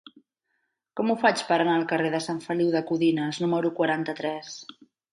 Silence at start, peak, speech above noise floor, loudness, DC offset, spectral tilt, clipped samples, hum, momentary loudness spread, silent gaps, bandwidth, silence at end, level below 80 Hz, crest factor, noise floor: 0.95 s; -6 dBFS; 52 dB; -25 LUFS; under 0.1%; -5.5 dB/octave; under 0.1%; none; 10 LU; none; 11.5 kHz; 0.5 s; -76 dBFS; 20 dB; -77 dBFS